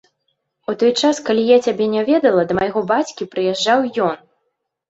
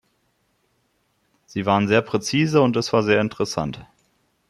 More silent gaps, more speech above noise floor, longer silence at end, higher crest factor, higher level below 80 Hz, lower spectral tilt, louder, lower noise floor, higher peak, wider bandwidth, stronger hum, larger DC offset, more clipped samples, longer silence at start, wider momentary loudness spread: neither; first, 56 dB vs 48 dB; about the same, 0.75 s vs 0.7 s; about the same, 16 dB vs 20 dB; about the same, -58 dBFS vs -58 dBFS; about the same, -4.5 dB/octave vs -5.5 dB/octave; first, -17 LUFS vs -21 LUFS; first, -73 dBFS vs -68 dBFS; about the same, -2 dBFS vs -4 dBFS; second, 8 kHz vs 12.5 kHz; neither; neither; neither; second, 0.7 s vs 1.55 s; second, 8 LU vs 11 LU